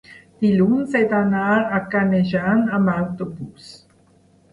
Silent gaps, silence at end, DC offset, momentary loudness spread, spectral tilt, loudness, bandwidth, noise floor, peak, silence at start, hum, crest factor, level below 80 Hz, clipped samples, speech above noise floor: none; 0.75 s; under 0.1%; 11 LU; -8.5 dB/octave; -19 LUFS; 10.5 kHz; -55 dBFS; -6 dBFS; 0.1 s; none; 14 dB; -56 dBFS; under 0.1%; 36 dB